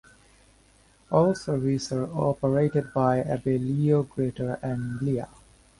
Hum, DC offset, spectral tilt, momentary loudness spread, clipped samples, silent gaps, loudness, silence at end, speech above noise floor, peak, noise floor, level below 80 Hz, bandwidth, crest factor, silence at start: none; under 0.1%; -7.5 dB/octave; 7 LU; under 0.1%; none; -26 LUFS; 0.55 s; 34 dB; -8 dBFS; -59 dBFS; -54 dBFS; 11.5 kHz; 20 dB; 1.1 s